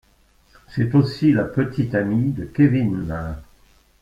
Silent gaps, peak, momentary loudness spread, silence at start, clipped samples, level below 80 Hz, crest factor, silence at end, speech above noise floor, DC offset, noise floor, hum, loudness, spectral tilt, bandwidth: none; -4 dBFS; 12 LU; 0.7 s; under 0.1%; -44 dBFS; 18 dB; 0.6 s; 38 dB; under 0.1%; -57 dBFS; none; -20 LUFS; -9 dB/octave; 7.6 kHz